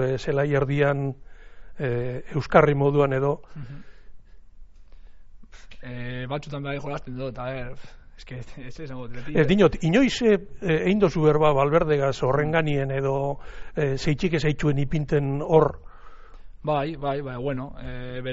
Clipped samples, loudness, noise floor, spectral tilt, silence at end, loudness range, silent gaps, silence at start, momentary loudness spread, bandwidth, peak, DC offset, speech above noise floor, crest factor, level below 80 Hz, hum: under 0.1%; -24 LUFS; -44 dBFS; -6 dB/octave; 0 s; 13 LU; none; 0 s; 18 LU; 8 kHz; -4 dBFS; under 0.1%; 20 dB; 20 dB; -42 dBFS; none